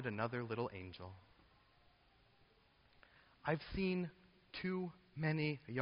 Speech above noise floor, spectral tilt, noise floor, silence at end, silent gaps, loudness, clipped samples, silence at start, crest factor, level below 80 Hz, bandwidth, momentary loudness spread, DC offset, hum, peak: 30 dB; -5.5 dB/octave; -72 dBFS; 0 s; none; -42 LUFS; under 0.1%; 0 s; 22 dB; -64 dBFS; 5.4 kHz; 13 LU; under 0.1%; none; -22 dBFS